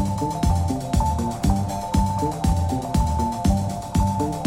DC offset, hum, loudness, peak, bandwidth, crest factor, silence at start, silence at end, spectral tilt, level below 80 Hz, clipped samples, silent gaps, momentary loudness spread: under 0.1%; none; -23 LUFS; -8 dBFS; 16.5 kHz; 14 dB; 0 s; 0 s; -6.5 dB/octave; -28 dBFS; under 0.1%; none; 2 LU